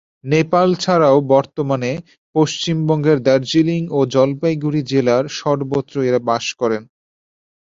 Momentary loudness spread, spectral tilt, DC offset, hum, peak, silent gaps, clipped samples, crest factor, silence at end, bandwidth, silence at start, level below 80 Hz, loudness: 7 LU; -6 dB/octave; under 0.1%; none; -2 dBFS; 2.18-2.33 s; under 0.1%; 16 dB; 0.95 s; 7.8 kHz; 0.25 s; -58 dBFS; -17 LUFS